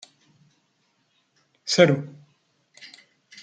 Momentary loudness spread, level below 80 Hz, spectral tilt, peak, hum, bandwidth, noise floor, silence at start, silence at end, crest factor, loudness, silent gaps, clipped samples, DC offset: 27 LU; -70 dBFS; -4.5 dB/octave; -2 dBFS; none; 9.4 kHz; -69 dBFS; 1.65 s; 0.55 s; 26 dB; -20 LUFS; none; under 0.1%; under 0.1%